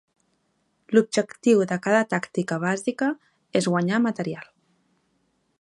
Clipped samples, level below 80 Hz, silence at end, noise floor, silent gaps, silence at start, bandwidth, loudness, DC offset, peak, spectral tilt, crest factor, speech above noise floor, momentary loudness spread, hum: under 0.1%; -74 dBFS; 1.15 s; -70 dBFS; none; 0.9 s; 11.5 kHz; -24 LUFS; under 0.1%; -4 dBFS; -5.5 dB/octave; 20 dB; 48 dB; 8 LU; none